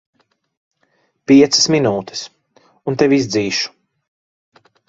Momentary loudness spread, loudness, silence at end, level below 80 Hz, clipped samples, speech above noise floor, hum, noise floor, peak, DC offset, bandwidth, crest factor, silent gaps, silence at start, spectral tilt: 18 LU; -14 LUFS; 1.2 s; -56 dBFS; under 0.1%; 49 dB; none; -63 dBFS; 0 dBFS; under 0.1%; 7.8 kHz; 18 dB; none; 1.3 s; -4 dB/octave